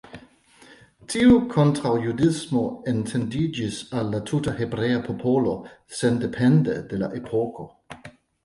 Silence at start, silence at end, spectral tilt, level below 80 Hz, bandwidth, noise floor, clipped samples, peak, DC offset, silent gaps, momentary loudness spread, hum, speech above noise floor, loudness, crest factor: 0.15 s; 0.35 s; -6.5 dB/octave; -50 dBFS; 11.5 kHz; -52 dBFS; under 0.1%; -6 dBFS; under 0.1%; none; 12 LU; none; 30 dB; -23 LUFS; 18 dB